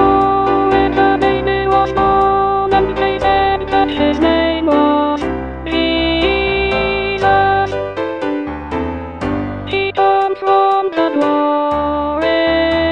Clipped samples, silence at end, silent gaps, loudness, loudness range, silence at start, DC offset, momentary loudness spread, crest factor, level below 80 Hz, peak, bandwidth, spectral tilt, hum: under 0.1%; 0 s; none; -14 LUFS; 3 LU; 0 s; 0.2%; 8 LU; 14 dB; -32 dBFS; 0 dBFS; 8.6 kHz; -6.5 dB/octave; none